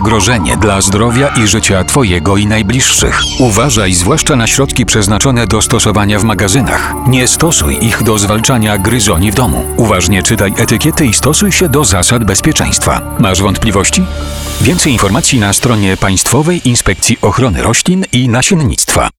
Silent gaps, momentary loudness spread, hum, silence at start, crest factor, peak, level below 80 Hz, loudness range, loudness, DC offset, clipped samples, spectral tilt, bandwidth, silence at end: none; 3 LU; none; 0 s; 10 dB; 0 dBFS; -24 dBFS; 1 LU; -9 LUFS; 0.5%; under 0.1%; -4 dB/octave; over 20 kHz; 0.1 s